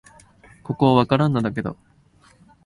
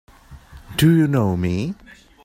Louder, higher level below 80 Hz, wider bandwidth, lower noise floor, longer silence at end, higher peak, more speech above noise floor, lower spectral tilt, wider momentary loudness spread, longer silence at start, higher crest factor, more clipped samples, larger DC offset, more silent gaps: about the same, -20 LUFS vs -19 LUFS; second, -52 dBFS vs -44 dBFS; second, 11 kHz vs 16 kHz; first, -55 dBFS vs -43 dBFS; first, 0.95 s vs 0.5 s; about the same, -2 dBFS vs -4 dBFS; first, 36 dB vs 26 dB; first, -8 dB/octave vs -6.5 dB/octave; about the same, 15 LU vs 14 LU; first, 0.7 s vs 0.3 s; about the same, 20 dB vs 16 dB; neither; neither; neither